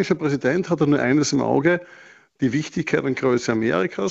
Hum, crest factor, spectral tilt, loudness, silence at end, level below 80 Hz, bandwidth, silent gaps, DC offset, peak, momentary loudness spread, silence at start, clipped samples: none; 16 dB; -5.5 dB/octave; -21 LUFS; 0 s; -56 dBFS; 8.2 kHz; none; under 0.1%; -4 dBFS; 5 LU; 0 s; under 0.1%